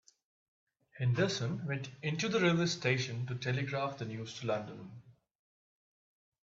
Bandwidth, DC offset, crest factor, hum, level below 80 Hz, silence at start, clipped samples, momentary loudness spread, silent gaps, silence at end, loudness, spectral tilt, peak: 7.8 kHz; under 0.1%; 22 dB; none; -72 dBFS; 0.95 s; under 0.1%; 11 LU; none; 1.35 s; -34 LUFS; -5.5 dB/octave; -16 dBFS